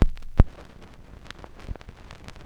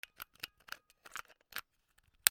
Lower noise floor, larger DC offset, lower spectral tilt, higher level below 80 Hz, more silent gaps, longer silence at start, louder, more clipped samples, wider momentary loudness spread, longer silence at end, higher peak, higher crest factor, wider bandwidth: second, -46 dBFS vs -74 dBFS; neither; first, -8 dB/octave vs 3 dB/octave; first, -28 dBFS vs -76 dBFS; neither; second, 0 s vs 0.2 s; first, -25 LUFS vs -43 LUFS; neither; first, 24 LU vs 7 LU; first, 0.15 s vs 0 s; about the same, 0 dBFS vs -2 dBFS; second, 26 dB vs 40 dB; second, 7 kHz vs over 20 kHz